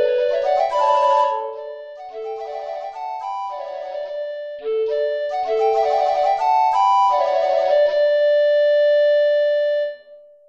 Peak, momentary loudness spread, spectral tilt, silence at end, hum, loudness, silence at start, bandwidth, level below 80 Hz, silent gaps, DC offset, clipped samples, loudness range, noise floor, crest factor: -6 dBFS; 14 LU; -1.5 dB/octave; 0.3 s; none; -19 LUFS; 0 s; 7.4 kHz; -64 dBFS; none; under 0.1%; under 0.1%; 10 LU; -45 dBFS; 12 dB